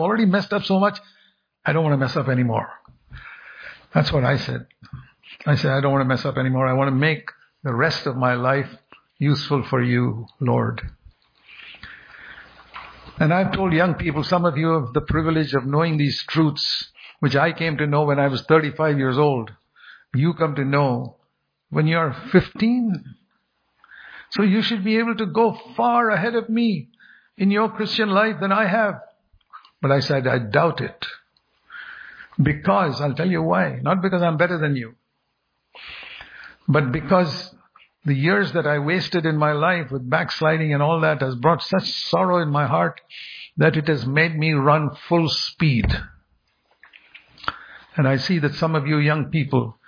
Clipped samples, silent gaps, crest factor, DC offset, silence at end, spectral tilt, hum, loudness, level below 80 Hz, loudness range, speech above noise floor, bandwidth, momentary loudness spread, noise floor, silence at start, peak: under 0.1%; none; 20 dB; under 0.1%; 0.15 s; -7.5 dB/octave; none; -20 LUFS; -46 dBFS; 4 LU; 53 dB; 5.2 kHz; 18 LU; -73 dBFS; 0 s; -2 dBFS